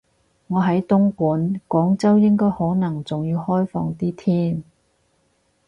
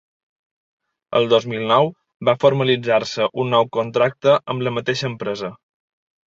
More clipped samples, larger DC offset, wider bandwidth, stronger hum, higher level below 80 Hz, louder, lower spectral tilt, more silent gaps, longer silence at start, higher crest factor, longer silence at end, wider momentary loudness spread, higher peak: neither; neither; about the same, 7.6 kHz vs 7.6 kHz; neither; first, -54 dBFS vs -62 dBFS; about the same, -20 LUFS vs -19 LUFS; first, -9 dB/octave vs -5.5 dB/octave; second, none vs 2.14-2.20 s; second, 0.5 s vs 1.1 s; about the same, 14 dB vs 18 dB; first, 1.05 s vs 0.75 s; about the same, 9 LU vs 8 LU; second, -6 dBFS vs -2 dBFS